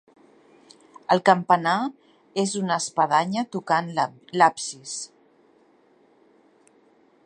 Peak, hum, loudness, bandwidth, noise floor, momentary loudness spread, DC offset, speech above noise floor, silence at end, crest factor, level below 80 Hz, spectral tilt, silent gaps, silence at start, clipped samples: -2 dBFS; none; -23 LUFS; 11 kHz; -59 dBFS; 14 LU; under 0.1%; 37 dB; 2.2 s; 24 dB; -76 dBFS; -4 dB/octave; none; 1.1 s; under 0.1%